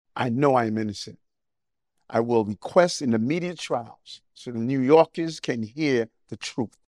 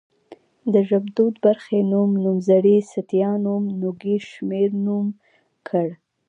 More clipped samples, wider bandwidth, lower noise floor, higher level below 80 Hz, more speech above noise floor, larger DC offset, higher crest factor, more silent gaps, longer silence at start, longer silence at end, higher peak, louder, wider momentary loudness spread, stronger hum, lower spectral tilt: neither; first, 11 kHz vs 7.8 kHz; first, -88 dBFS vs -48 dBFS; first, -68 dBFS vs -74 dBFS; first, 64 dB vs 29 dB; neither; first, 22 dB vs 16 dB; neither; second, 0.15 s vs 0.3 s; second, 0.2 s vs 0.35 s; about the same, -4 dBFS vs -4 dBFS; second, -24 LUFS vs -21 LUFS; first, 17 LU vs 8 LU; neither; second, -6 dB/octave vs -9 dB/octave